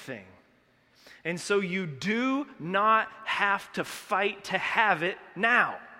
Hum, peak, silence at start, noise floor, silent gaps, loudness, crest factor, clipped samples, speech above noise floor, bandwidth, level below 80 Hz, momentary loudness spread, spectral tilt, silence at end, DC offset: none; -8 dBFS; 0 s; -64 dBFS; none; -27 LUFS; 22 dB; under 0.1%; 36 dB; 16 kHz; -72 dBFS; 12 LU; -4.5 dB/octave; 0 s; under 0.1%